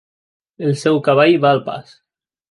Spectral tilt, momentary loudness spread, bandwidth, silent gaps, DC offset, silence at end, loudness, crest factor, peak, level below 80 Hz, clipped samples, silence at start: -6.5 dB/octave; 14 LU; 11.5 kHz; none; under 0.1%; 0.7 s; -15 LUFS; 16 dB; -2 dBFS; -66 dBFS; under 0.1%; 0.6 s